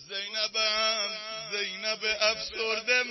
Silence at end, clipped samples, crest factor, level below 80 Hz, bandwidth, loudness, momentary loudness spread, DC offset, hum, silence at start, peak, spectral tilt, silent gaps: 0 s; under 0.1%; 20 dB; -66 dBFS; 6.2 kHz; -28 LUFS; 7 LU; under 0.1%; none; 0 s; -8 dBFS; 0 dB/octave; none